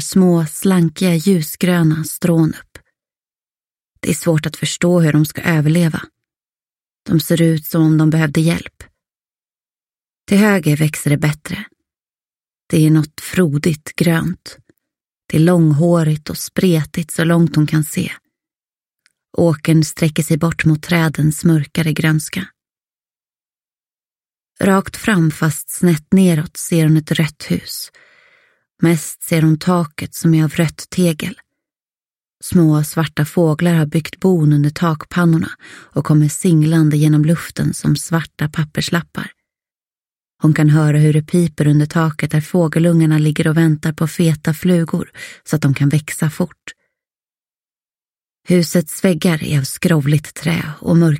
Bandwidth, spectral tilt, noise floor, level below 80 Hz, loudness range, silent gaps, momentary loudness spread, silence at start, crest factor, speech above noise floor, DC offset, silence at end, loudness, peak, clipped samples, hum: 16.5 kHz; -6.5 dB/octave; under -90 dBFS; -48 dBFS; 4 LU; 31.82-31.86 s; 9 LU; 0 s; 16 dB; over 76 dB; under 0.1%; 0 s; -15 LUFS; 0 dBFS; under 0.1%; none